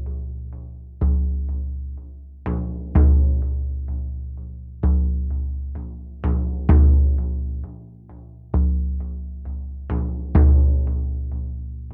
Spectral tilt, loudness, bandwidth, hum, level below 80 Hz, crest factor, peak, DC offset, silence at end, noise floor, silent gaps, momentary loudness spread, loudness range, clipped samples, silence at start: -13.5 dB/octave; -22 LUFS; 2.5 kHz; none; -22 dBFS; 16 dB; -4 dBFS; under 0.1%; 0 s; -41 dBFS; none; 19 LU; 4 LU; under 0.1%; 0 s